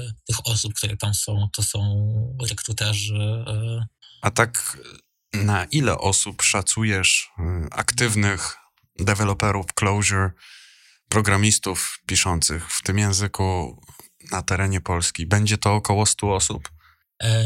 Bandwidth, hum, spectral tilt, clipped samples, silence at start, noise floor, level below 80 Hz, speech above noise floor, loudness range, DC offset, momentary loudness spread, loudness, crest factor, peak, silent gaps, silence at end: 16 kHz; none; -3.5 dB/octave; under 0.1%; 0 s; -53 dBFS; -46 dBFS; 30 dB; 4 LU; under 0.1%; 9 LU; -22 LUFS; 20 dB; -2 dBFS; none; 0 s